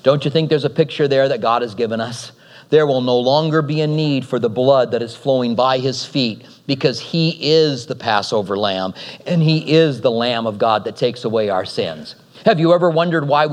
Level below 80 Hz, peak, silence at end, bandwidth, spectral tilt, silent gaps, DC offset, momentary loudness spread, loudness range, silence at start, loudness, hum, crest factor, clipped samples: -68 dBFS; 0 dBFS; 0 s; 10.5 kHz; -6 dB/octave; none; under 0.1%; 9 LU; 1 LU; 0.05 s; -17 LUFS; none; 16 dB; under 0.1%